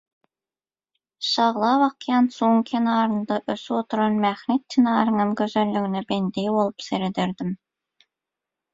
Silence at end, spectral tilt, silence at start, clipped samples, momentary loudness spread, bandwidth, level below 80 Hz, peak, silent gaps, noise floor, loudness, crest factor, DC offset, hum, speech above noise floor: 1.2 s; -6 dB/octave; 1.2 s; under 0.1%; 7 LU; 7.8 kHz; -66 dBFS; -4 dBFS; none; under -90 dBFS; -22 LUFS; 20 dB; under 0.1%; none; over 68 dB